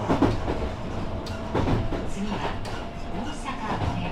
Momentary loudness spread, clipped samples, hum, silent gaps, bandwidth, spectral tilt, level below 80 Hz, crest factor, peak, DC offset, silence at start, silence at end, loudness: 9 LU; under 0.1%; none; none; 12 kHz; -6.5 dB/octave; -34 dBFS; 18 dB; -8 dBFS; under 0.1%; 0 s; 0 s; -29 LUFS